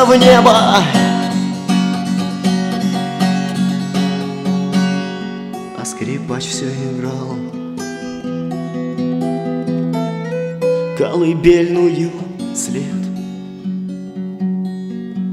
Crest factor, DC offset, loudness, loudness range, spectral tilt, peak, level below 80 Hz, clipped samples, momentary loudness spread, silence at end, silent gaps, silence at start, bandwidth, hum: 16 dB; under 0.1%; -17 LUFS; 7 LU; -5.5 dB/octave; 0 dBFS; -46 dBFS; under 0.1%; 14 LU; 0 s; none; 0 s; 13.5 kHz; none